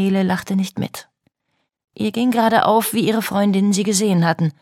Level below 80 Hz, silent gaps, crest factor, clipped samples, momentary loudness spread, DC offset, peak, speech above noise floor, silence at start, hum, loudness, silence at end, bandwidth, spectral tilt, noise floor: -62 dBFS; 1.84-1.88 s; 16 dB; under 0.1%; 10 LU; under 0.1%; -2 dBFS; 54 dB; 0 s; none; -18 LUFS; 0.1 s; 16.5 kHz; -5 dB/octave; -72 dBFS